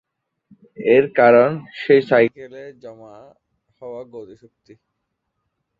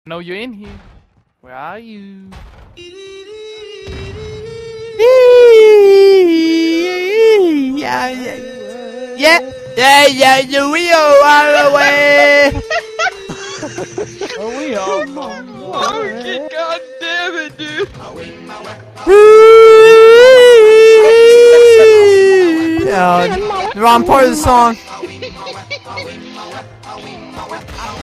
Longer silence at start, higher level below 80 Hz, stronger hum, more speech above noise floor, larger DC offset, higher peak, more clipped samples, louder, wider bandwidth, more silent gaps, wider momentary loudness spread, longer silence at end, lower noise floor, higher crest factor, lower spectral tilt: first, 0.8 s vs 0.1 s; second, -66 dBFS vs -40 dBFS; neither; first, 58 dB vs 40 dB; neither; about the same, -2 dBFS vs 0 dBFS; second, under 0.1% vs 0.7%; second, -16 LUFS vs -7 LUFS; second, 5 kHz vs 15 kHz; neither; about the same, 25 LU vs 24 LU; first, 1.55 s vs 0 s; first, -76 dBFS vs -48 dBFS; first, 18 dB vs 10 dB; first, -8 dB/octave vs -3.5 dB/octave